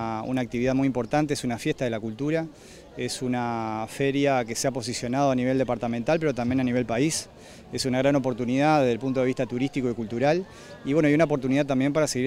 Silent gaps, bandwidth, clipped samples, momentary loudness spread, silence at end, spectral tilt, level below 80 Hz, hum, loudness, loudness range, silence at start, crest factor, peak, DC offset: none; 15.5 kHz; under 0.1%; 7 LU; 0 s; -5.5 dB/octave; -54 dBFS; none; -25 LUFS; 3 LU; 0 s; 16 dB; -10 dBFS; under 0.1%